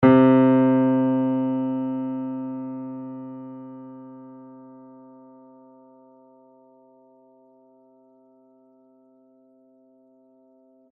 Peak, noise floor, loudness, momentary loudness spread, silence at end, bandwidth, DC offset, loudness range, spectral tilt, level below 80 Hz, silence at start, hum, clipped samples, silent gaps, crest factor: -4 dBFS; -57 dBFS; -21 LUFS; 28 LU; 6.3 s; 3.9 kHz; under 0.1%; 27 LU; -8 dB/octave; -66 dBFS; 0 s; none; under 0.1%; none; 22 dB